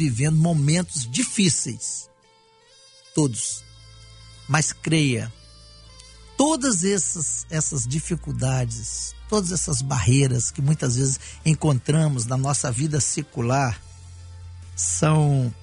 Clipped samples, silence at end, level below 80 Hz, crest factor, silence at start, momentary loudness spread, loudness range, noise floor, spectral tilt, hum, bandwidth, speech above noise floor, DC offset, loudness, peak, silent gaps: under 0.1%; 0 s; -46 dBFS; 18 dB; 0 s; 10 LU; 4 LU; -57 dBFS; -4.5 dB/octave; none; 11 kHz; 35 dB; under 0.1%; -22 LUFS; -4 dBFS; none